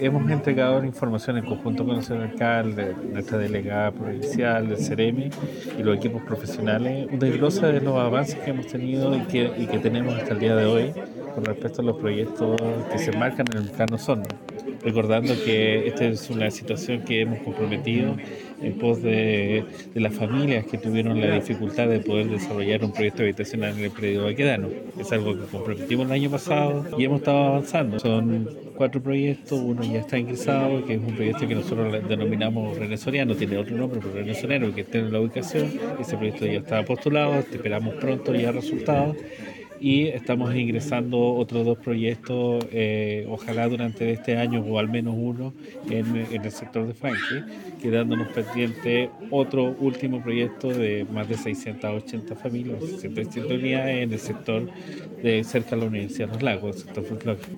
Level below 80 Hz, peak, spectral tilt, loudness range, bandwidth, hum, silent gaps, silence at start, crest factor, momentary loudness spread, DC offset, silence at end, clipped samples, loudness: -62 dBFS; -6 dBFS; -6.5 dB/octave; 3 LU; 17 kHz; none; none; 0 s; 18 dB; 8 LU; under 0.1%; 0 s; under 0.1%; -25 LUFS